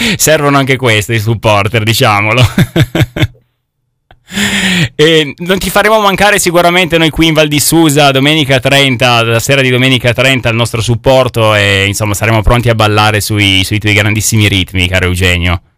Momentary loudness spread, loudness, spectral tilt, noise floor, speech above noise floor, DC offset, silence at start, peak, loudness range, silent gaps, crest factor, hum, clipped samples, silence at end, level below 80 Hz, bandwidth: 5 LU; -8 LUFS; -4 dB/octave; -64 dBFS; 56 dB; under 0.1%; 0 s; 0 dBFS; 4 LU; none; 8 dB; none; 1%; 0.2 s; -28 dBFS; 16.5 kHz